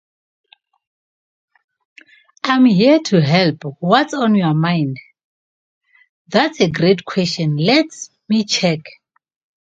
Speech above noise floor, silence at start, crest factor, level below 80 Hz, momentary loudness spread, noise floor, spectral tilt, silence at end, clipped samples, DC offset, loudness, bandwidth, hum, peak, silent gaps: over 75 dB; 2.45 s; 18 dB; -58 dBFS; 11 LU; under -90 dBFS; -5.5 dB/octave; 0.85 s; under 0.1%; under 0.1%; -16 LUFS; 8.8 kHz; none; 0 dBFS; 5.24-5.81 s, 6.09-6.25 s